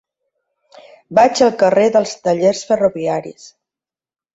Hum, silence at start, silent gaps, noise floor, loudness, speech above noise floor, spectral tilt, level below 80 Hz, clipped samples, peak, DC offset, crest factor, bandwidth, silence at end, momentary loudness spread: none; 1.1 s; none; under -90 dBFS; -15 LUFS; over 75 dB; -4.5 dB/octave; -58 dBFS; under 0.1%; -2 dBFS; under 0.1%; 16 dB; 8 kHz; 0.85 s; 9 LU